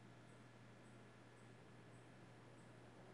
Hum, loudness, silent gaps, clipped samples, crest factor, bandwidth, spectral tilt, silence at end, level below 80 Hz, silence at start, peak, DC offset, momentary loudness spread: none; -64 LUFS; none; under 0.1%; 12 dB; 11 kHz; -5.5 dB/octave; 0 s; -84 dBFS; 0 s; -50 dBFS; under 0.1%; 1 LU